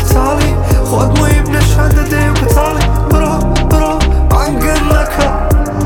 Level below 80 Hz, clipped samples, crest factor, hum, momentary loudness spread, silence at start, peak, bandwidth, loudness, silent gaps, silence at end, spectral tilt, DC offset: -12 dBFS; under 0.1%; 10 dB; none; 3 LU; 0 s; 0 dBFS; 18 kHz; -12 LUFS; none; 0 s; -6 dB/octave; under 0.1%